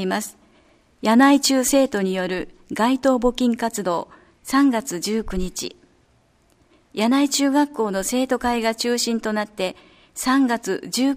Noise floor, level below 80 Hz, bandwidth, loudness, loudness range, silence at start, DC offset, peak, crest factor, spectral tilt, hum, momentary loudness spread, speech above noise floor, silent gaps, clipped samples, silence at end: -60 dBFS; -44 dBFS; 15.5 kHz; -21 LUFS; 5 LU; 0 s; under 0.1%; -2 dBFS; 18 dB; -3.5 dB/octave; none; 12 LU; 39 dB; none; under 0.1%; 0 s